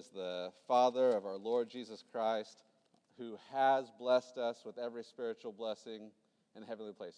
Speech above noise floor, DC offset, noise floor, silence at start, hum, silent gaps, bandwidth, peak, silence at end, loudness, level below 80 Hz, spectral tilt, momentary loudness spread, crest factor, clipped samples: 33 dB; under 0.1%; -70 dBFS; 0 s; none; none; 10 kHz; -18 dBFS; 0.05 s; -37 LUFS; under -90 dBFS; -4.5 dB/octave; 18 LU; 20 dB; under 0.1%